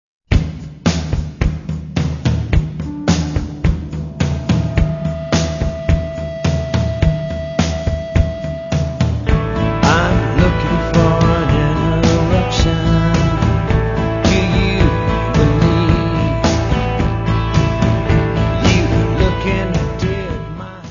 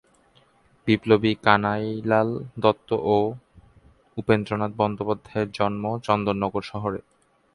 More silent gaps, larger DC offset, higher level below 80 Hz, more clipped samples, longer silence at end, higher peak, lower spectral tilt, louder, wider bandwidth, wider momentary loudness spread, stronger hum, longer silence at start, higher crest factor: neither; neither; first, -22 dBFS vs -54 dBFS; neither; second, 0 s vs 0.55 s; about the same, 0 dBFS vs -2 dBFS; about the same, -6.5 dB/octave vs -7.5 dB/octave; first, -16 LUFS vs -24 LUFS; second, 7.4 kHz vs 11 kHz; second, 7 LU vs 10 LU; neither; second, 0.3 s vs 0.85 s; second, 16 dB vs 22 dB